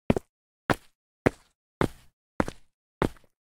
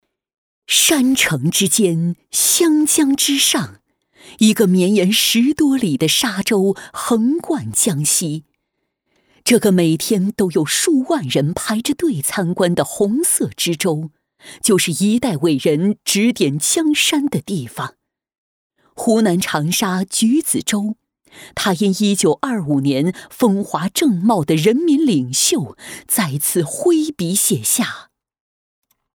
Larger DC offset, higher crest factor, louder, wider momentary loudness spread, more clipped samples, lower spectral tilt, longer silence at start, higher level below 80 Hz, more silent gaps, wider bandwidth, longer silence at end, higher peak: neither; first, 28 dB vs 16 dB; second, -31 LUFS vs -16 LUFS; second, 3 LU vs 8 LU; neither; first, -6.5 dB/octave vs -3.5 dB/octave; second, 0.1 s vs 0.7 s; first, -46 dBFS vs -56 dBFS; first, 0.29-0.69 s, 0.95-1.25 s, 1.55-1.81 s, 2.13-2.39 s, 2.74-3.01 s vs 18.38-18.70 s; second, 17 kHz vs over 20 kHz; second, 0.4 s vs 1.15 s; second, -4 dBFS vs 0 dBFS